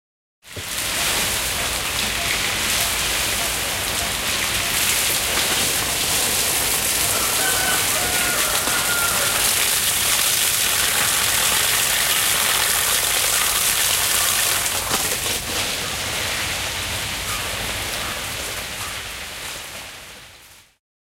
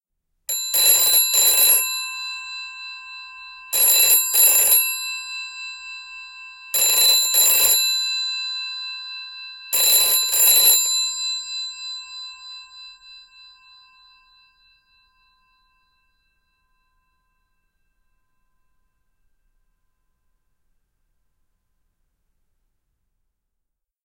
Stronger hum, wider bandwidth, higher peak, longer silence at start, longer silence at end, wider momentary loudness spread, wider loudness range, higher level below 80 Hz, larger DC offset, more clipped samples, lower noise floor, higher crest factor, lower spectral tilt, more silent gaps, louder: neither; about the same, 16 kHz vs 17.5 kHz; about the same, -4 dBFS vs -2 dBFS; about the same, 0.45 s vs 0.5 s; second, 0.65 s vs 10.85 s; second, 10 LU vs 23 LU; about the same, 8 LU vs 7 LU; first, -42 dBFS vs -64 dBFS; neither; neither; second, -47 dBFS vs -79 dBFS; about the same, 18 dB vs 20 dB; first, 0 dB/octave vs 3.5 dB/octave; neither; second, -18 LUFS vs -15 LUFS